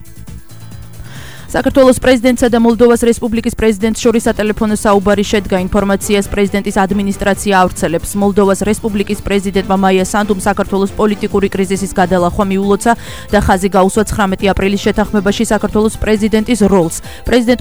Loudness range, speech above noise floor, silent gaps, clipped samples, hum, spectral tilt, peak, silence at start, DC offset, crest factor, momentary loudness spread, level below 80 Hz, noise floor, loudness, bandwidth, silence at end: 2 LU; 20 dB; none; 0.1%; none; -5.5 dB/octave; 0 dBFS; 0.15 s; 2%; 12 dB; 6 LU; -30 dBFS; -32 dBFS; -12 LUFS; over 20 kHz; 0 s